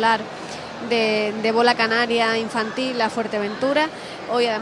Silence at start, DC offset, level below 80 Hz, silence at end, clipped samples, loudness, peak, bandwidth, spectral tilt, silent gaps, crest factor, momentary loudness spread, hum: 0 s; under 0.1%; -62 dBFS; 0 s; under 0.1%; -21 LUFS; -4 dBFS; 11.5 kHz; -4 dB/octave; none; 18 dB; 12 LU; none